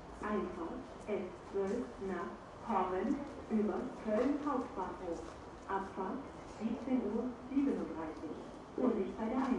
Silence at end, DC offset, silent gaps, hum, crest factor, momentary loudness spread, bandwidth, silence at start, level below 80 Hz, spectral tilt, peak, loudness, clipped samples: 0 s; under 0.1%; none; none; 18 dB; 11 LU; 11 kHz; 0 s; -60 dBFS; -7 dB/octave; -20 dBFS; -39 LUFS; under 0.1%